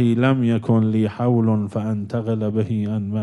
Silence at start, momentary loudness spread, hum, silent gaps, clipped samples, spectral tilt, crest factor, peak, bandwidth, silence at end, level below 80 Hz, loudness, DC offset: 0 s; 6 LU; none; none; under 0.1%; -9.5 dB/octave; 14 dB; -6 dBFS; 8.6 kHz; 0 s; -62 dBFS; -20 LUFS; under 0.1%